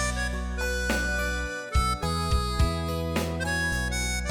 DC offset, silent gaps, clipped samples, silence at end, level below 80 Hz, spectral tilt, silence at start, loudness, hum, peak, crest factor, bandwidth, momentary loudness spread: under 0.1%; none; under 0.1%; 0 s; -32 dBFS; -4 dB/octave; 0 s; -28 LUFS; none; -12 dBFS; 14 dB; 17 kHz; 3 LU